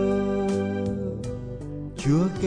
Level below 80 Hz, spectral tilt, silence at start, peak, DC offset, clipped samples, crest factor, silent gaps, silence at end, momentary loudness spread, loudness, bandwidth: -44 dBFS; -7.5 dB/octave; 0 s; -10 dBFS; under 0.1%; under 0.1%; 16 dB; none; 0 s; 12 LU; -27 LUFS; 10 kHz